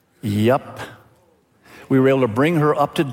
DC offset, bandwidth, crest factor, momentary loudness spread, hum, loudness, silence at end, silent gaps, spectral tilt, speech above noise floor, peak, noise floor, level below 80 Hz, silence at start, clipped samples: under 0.1%; 16.5 kHz; 16 dB; 18 LU; none; -18 LUFS; 0 s; none; -7.5 dB/octave; 40 dB; -4 dBFS; -57 dBFS; -60 dBFS; 0.25 s; under 0.1%